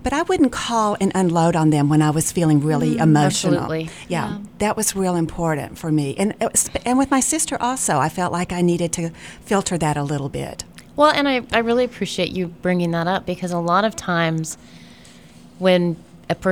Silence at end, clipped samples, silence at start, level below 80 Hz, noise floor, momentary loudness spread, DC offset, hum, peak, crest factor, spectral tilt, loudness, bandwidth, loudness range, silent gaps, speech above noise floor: 0 s; under 0.1%; 0 s; -46 dBFS; -45 dBFS; 9 LU; 0.2%; none; -2 dBFS; 18 dB; -5 dB/octave; -20 LUFS; 16.5 kHz; 4 LU; none; 25 dB